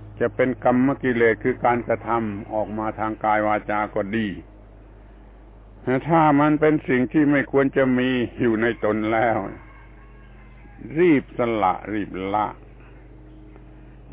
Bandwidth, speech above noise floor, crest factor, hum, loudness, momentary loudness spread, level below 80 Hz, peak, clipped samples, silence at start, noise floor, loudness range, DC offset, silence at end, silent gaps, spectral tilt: 4 kHz; 24 dB; 16 dB; none; -21 LUFS; 9 LU; -46 dBFS; -6 dBFS; under 0.1%; 0 s; -45 dBFS; 5 LU; under 0.1%; 0 s; none; -10.5 dB/octave